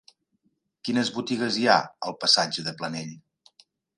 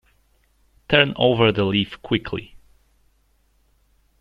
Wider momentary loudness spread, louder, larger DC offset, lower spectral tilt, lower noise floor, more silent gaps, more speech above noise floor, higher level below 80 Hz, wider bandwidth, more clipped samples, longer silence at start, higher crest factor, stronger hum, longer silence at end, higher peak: first, 15 LU vs 10 LU; second, -24 LUFS vs -20 LUFS; neither; second, -3 dB/octave vs -7.5 dB/octave; first, -72 dBFS vs -62 dBFS; neither; first, 47 dB vs 43 dB; second, -74 dBFS vs -50 dBFS; first, 11.5 kHz vs 6.6 kHz; neither; about the same, 0.85 s vs 0.9 s; about the same, 24 dB vs 22 dB; neither; second, 0.8 s vs 1.75 s; about the same, -4 dBFS vs -2 dBFS